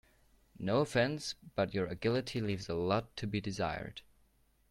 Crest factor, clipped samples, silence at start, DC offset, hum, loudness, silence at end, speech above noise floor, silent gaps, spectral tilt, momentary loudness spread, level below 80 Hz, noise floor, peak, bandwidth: 18 dB; under 0.1%; 0.6 s; under 0.1%; none; -35 LUFS; 0.7 s; 35 dB; none; -5.5 dB/octave; 9 LU; -60 dBFS; -70 dBFS; -18 dBFS; 14 kHz